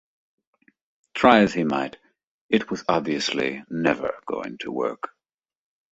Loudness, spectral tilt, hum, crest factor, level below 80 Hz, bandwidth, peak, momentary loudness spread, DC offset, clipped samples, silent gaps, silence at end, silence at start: -23 LUFS; -5 dB/octave; none; 24 dB; -58 dBFS; 8.2 kHz; -2 dBFS; 15 LU; under 0.1%; under 0.1%; 2.24-2.49 s; 0.85 s; 1.15 s